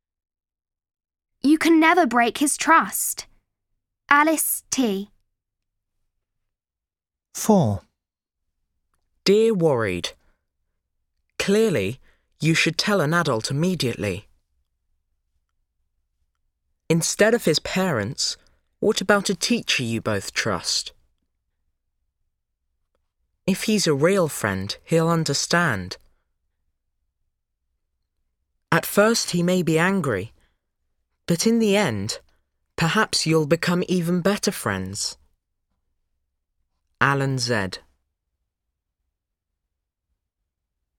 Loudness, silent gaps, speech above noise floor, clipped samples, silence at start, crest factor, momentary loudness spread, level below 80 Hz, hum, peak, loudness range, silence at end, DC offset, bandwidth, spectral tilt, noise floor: -21 LUFS; none; over 69 dB; under 0.1%; 1.45 s; 24 dB; 12 LU; -58 dBFS; none; 0 dBFS; 8 LU; 3.2 s; under 0.1%; 17.5 kHz; -4 dB/octave; under -90 dBFS